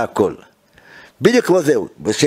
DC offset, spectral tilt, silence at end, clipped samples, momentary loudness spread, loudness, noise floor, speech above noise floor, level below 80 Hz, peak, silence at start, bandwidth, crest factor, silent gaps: under 0.1%; -5 dB/octave; 0 s; under 0.1%; 8 LU; -16 LUFS; -47 dBFS; 31 dB; -56 dBFS; 0 dBFS; 0 s; 16 kHz; 16 dB; none